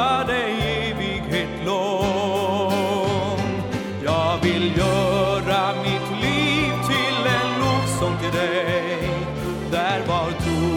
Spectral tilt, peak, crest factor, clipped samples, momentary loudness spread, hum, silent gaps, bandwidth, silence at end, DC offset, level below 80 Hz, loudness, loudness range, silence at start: -5 dB/octave; -6 dBFS; 14 dB; under 0.1%; 5 LU; none; none; 18 kHz; 0 s; under 0.1%; -40 dBFS; -22 LUFS; 2 LU; 0 s